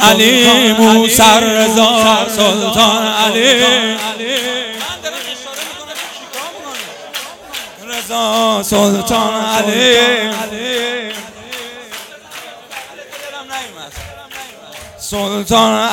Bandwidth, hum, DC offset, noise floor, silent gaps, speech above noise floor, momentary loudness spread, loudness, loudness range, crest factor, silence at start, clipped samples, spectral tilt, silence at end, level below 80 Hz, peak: over 20 kHz; none; under 0.1%; -33 dBFS; none; 23 dB; 21 LU; -11 LUFS; 17 LU; 14 dB; 0 s; 0.4%; -2.5 dB/octave; 0 s; -46 dBFS; 0 dBFS